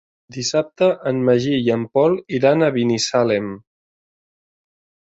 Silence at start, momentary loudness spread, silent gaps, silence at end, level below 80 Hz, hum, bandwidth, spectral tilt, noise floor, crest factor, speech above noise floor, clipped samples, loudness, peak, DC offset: 0.3 s; 8 LU; none; 1.5 s; -60 dBFS; none; 8.2 kHz; -5 dB/octave; under -90 dBFS; 16 dB; over 72 dB; under 0.1%; -18 LUFS; -2 dBFS; under 0.1%